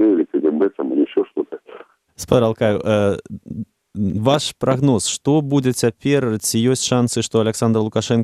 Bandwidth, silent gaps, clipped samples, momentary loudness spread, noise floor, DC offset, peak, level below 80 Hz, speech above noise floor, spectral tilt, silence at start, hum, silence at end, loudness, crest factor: 15 kHz; none; under 0.1%; 12 LU; -42 dBFS; under 0.1%; -2 dBFS; -52 dBFS; 25 dB; -5.5 dB/octave; 0 s; none; 0 s; -18 LUFS; 16 dB